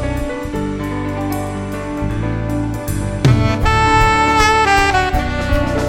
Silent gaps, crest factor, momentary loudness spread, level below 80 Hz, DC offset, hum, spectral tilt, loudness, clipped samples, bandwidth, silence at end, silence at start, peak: none; 16 dB; 10 LU; -24 dBFS; under 0.1%; none; -5.5 dB/octave; -16 LUFS; under 0.1%; 17 kHz; 0 s; 0 s; 0 dBFS